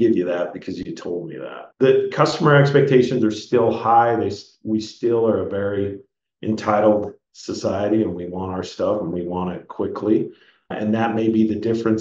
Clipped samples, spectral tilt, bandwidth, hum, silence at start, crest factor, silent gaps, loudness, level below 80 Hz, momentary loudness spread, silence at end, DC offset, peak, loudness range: under 0.1%; -7 dB/octave; 7.8 kHz; none; 0 s; 18 dB; none; -20 LUFS; -60 dBFS; 15 LU; 0 s; under 0.1%; -2 dBFS; 6 LU